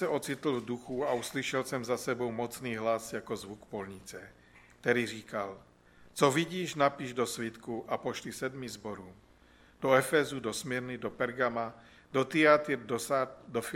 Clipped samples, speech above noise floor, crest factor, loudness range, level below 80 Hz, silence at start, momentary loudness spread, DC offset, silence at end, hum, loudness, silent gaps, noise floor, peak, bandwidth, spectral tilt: under 0.1%; 28 dB; 24 dB; 5 LU; -66 dBFS; 0 s; 14 LU; under 0.1%; 0 s; none; -32 LUFS; none; -61 dBFS; -8 dBFS; 16.5 kHz; -4.5 dB/octave